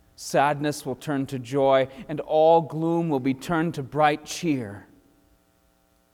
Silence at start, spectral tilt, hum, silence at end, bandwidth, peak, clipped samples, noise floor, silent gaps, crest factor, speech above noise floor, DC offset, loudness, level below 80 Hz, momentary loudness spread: 0.2 s; -6 dB/octave; none; 1.35 s; 16.5 kHz; -6 dBFS; under 0.1%; -64 dBFS; none; 18 dB; 40 dB; under 0.1%; -24 LUFS; -60 dBFS; 10 LU